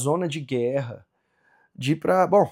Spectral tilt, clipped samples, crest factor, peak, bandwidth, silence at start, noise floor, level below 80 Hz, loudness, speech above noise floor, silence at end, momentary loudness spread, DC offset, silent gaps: -6 dB/octave; under 0.1%; 18 dB; -6 dBFS; 16.5 kHz; 0 s; -65 dBFS; -72 dBFS; -24 LUFS; 42 dB; 0 s; 14 LU; under 0.1%; none